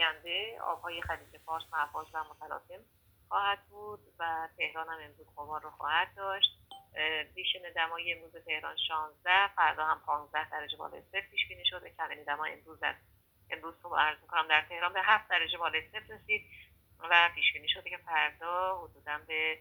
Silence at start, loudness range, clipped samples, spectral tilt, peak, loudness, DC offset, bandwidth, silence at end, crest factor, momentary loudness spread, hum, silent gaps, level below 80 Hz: 0 s; 8 LU; under 0.1%; -2.5 dB/octave; -8 dBFS; -32 LUFS; under 0.1%; over 20 kHz; 0 s; 26 dB; 15 LU; none; none; -66 dBFS